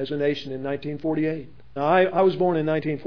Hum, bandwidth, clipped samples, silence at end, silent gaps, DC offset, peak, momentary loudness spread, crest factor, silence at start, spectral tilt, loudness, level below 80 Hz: none; 5.4 kHz; under 0.1%; 0 s; none; 0.7%; -6 dBFS; 10 LU; 16 dB; 0 s; -8.5 dB/octave; -23 LUFS; -58 dBFS